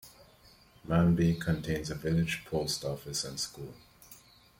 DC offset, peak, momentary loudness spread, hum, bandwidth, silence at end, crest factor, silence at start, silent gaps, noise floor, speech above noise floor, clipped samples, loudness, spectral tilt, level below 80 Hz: under 0.1%; -14 dBFS; 24 LU; none; 16.5 kHz; 0.4 s; 18 dB; 0.05 s; none; -60 dBFS; 29 dB; under 0.1%; -31 LUFS; -5.5 dB/octave; -52 dBFS